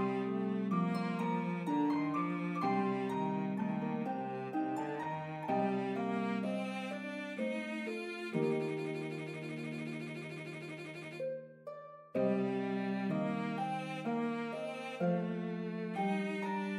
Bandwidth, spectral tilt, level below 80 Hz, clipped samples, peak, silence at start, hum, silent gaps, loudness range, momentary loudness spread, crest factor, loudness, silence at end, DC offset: 11.5 kHz; -7.5 dB/octave; -86 dBFS; under 0.1%; -22 dBFS; 0 s; none; none; 5 LU; 8 LU; 14 dB; -37 LUFS; 0 s; under 0.1%